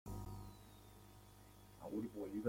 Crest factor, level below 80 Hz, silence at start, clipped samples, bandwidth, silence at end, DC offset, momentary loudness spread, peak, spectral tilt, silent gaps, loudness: 22 dB; -62 dBFS; 0.05 s; under 0.1%; 16.5 kHz; 0 s; under 0.1%; 16 LU; -28 dBFS; -7 dB/octave; none; -51 LUFS